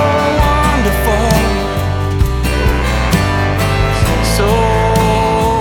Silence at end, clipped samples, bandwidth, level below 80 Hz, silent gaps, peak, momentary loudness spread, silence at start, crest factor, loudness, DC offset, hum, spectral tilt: 0 s; under 0.1%; 19.5 kHz; -18 dBFS; none; 0 dBFS; 3 LU; 0 s; 12 dB; -13 LUFS; under 0.1%; none; -5.5 dB/octave